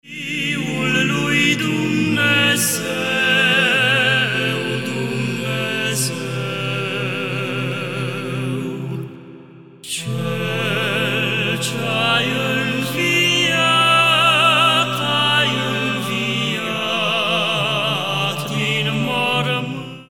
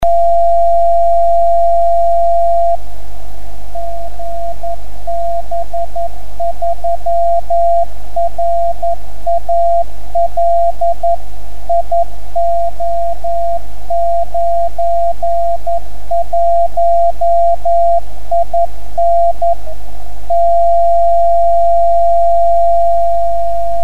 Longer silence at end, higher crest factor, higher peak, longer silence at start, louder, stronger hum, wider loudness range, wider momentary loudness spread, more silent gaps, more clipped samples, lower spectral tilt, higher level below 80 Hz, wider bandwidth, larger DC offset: about the same, 0.05 s vs 0 s; first, 16 dB vs 8 dB; about the same, -2 dBFS vs -2 dBFS; about the same, 0.05 s vs 0 s; second, -17 LUFS vs -14 LUFS; neither; about the same, 9 LU vs 7 LU; about the same, 10 LU vs 12 LU; neither; neither; second, -3.5 dB/octave vs -6.5 dB/octave; second, -64 dBFS vs -32 dBFS; first, 17.5 kHz vs 15 kHz; second, 0.4% vs 40%